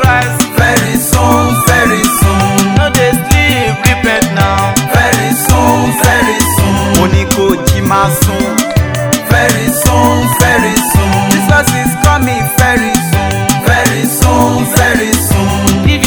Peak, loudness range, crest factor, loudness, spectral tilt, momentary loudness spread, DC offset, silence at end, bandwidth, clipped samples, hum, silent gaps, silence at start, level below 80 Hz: 0 dBFS; 1 LU; 10 dB; -9 LUFS; -4.5 dB/octave; 3 LU; under 0.1%; 0 s; over 20 kHz; 1%; none; none; 0 s; -22 dBFS